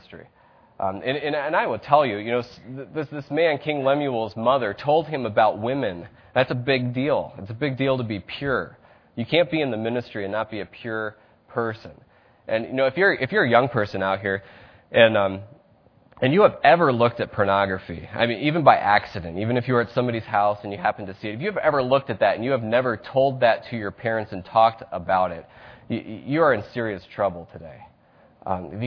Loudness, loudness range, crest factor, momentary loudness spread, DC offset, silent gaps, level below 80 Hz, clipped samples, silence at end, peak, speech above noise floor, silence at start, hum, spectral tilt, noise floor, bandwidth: -23 LUFS; 6 LU; 22 dB; 13 LU; under 0.1%; none; -58 dBFS; under 0.1%; 0 s; 0 dBFS; 34 dB; 0.1 s; none; -8.5 dB/octave; -57 dBFS; 5.4 kHz